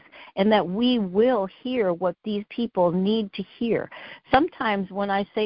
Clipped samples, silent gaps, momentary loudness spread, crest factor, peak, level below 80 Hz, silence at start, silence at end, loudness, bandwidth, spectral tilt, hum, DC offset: under 0.1%; none; 9 LU; 20 dB; -4 dBFS; -56 dBFS; 0.15 s; 0 s; -24 LUFS; 5.4 kHz; -10.5 dB/octave; none; under 0.1%